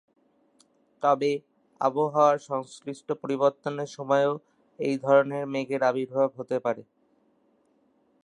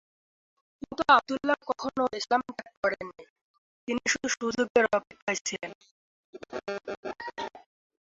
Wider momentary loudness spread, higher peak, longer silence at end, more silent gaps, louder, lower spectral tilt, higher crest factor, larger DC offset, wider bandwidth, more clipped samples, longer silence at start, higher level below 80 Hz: second, 12 LU vs 19 LU; about the same, -8 dBFS vs -8 dBFS; first, 1.4 s vs 0.45 s; second, none vs 2.77-2.83 s, 3.30-3.87 s, 4.70-4.75 s, 5.22-5.27 s, 5.41-5.45 s, 5.75-5.81 s, 5.91-6.33 s, 6.97-7.03 s; first, -26 LUFS vs -29 LUFS; first, -6 dB/octave vs -2.5 dB/octave; about the same, 20 dB vs 22 dB; neither; first, 10.5 kHz vs 8 kHz; neither; about the same, 1 s vs 0.9 s; second, -80 dBFS vs -66 dBFS